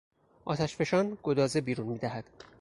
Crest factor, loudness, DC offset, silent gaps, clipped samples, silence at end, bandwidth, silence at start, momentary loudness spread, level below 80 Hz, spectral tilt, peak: 18 dB; -31 LUFS; under 0.1%; none; under 0.1%; 0.15 s; 11.5 kHz; 0.45 s; 14 LU; -62 dBFS; -6 dB/octave; -14 dBFS